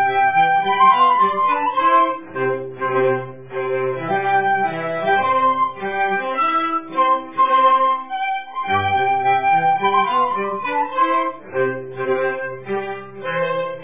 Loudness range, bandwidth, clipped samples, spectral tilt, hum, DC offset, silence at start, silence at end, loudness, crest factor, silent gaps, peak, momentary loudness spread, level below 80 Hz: 3 LU; 3.8 kHz; under 0.1%; -8.5 dB/octave; none; 0.6%; 0 s; 0 s; -18 LUFS; 16 dB; none; -4 dBFS; 10 LU; -60 dBFS